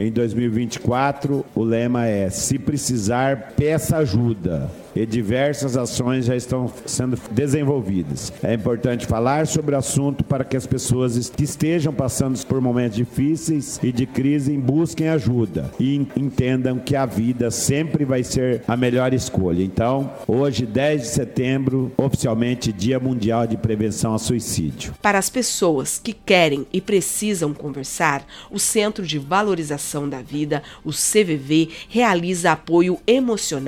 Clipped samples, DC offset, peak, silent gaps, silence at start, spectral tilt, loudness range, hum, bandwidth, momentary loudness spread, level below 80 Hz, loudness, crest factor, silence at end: under 0.1%; under 0.1%; 0 dBFS; none; 0 s; -5 dB/octave; 2 LU; none; 17.5 kHz; 6 LU; -44 dBFS; -21 LUFS; 20 dB; 0 s